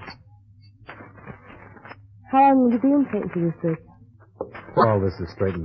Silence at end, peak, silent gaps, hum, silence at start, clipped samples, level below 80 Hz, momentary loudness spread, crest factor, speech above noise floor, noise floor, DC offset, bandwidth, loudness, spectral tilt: 0 s; -4 dBFS; none; none; 0 s; under 0.1%; -54 dBFS; 26 LU; 20 dB; 31 dB; -50 dBFS; under 0.1%; 5.8 kHz; -21 LUFS; -10.5 dB/octave